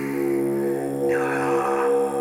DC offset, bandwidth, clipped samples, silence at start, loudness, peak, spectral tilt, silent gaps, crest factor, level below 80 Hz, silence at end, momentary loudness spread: under 0.1%; 18 kHz; under 0.1%; 0 s; -23 LUFS; -10 dBFS; -6.5 dB/octave; none; 12 dB; -62 dBFS; 0 s; 3 LU